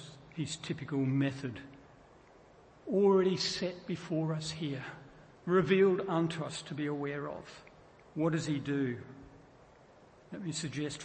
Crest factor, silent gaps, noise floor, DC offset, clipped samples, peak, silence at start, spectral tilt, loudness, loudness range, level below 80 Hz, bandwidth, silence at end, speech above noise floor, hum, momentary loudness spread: 18 dB; none; -59 dBFS; under 0.1%; under 0.1%; -16 dBFS; 0 s; -5.5 dB/octave; -33 LUFS; 6 LU; -68 dBFS; 8.8 kHz; 0 s; 27 dB; none; 20 LU